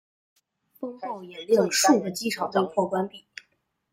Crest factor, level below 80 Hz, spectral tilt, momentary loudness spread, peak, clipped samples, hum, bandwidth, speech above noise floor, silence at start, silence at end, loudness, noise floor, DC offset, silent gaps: 18 dB; -72 dBFS; -3.5 dB/octave; 20 LU; -8 dBFS; under 0.1%; none; 16 kHz; 47 dB; 0.8 s; 0.75 s; -24 LUFS; -72 dBFS; under 0.1%; none